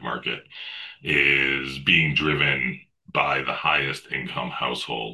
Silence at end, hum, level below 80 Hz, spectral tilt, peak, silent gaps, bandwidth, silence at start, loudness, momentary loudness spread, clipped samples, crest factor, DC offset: 0 s; none; -50 dBFS; -5 dB/octave; -4 dBFS; none; 12.5 kHz; 0 s; -22 LUFS; 15 LU; under 0.1%; 20 dB; under 0.1%